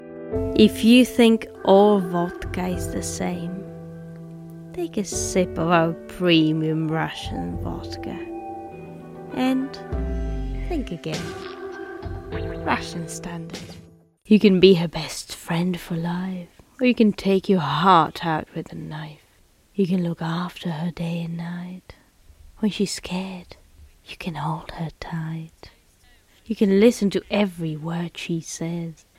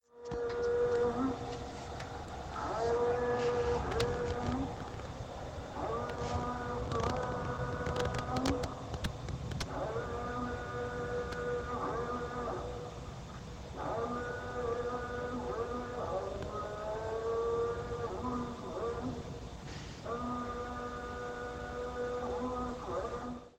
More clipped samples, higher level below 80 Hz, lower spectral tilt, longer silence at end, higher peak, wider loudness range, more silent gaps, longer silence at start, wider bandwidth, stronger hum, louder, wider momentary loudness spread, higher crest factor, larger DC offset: neither; first, -40 dBFS vs -50 dBFS; about the same, -5.5 dB/octave vs -6 dB/octave; first, 0.25 s vs 0.05 s; first, 0 dBFS vs -18 dBFS; first, 9 LU vs 5 LU; neither; second, 0 s vs 0.15 s; first, 16 kHz vs 13 kHz; neither; first, -22 LUFS vs -37 LUFS; first, 19 LU vs 11 LU; about the same, 22 dB vs 18 dB; neither